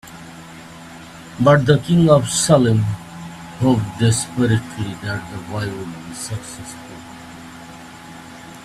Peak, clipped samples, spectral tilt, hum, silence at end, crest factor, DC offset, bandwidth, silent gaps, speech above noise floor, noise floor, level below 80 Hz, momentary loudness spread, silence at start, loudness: 0 dBFS; under 0.1%; -5.5 dB/octave; none; 0 s; 20 dB; under 0.1%; 15 kHz; none; 21 dB; -38 dBFS; -48 dBFS; 23 LU; 0.05 s; -18 LUFS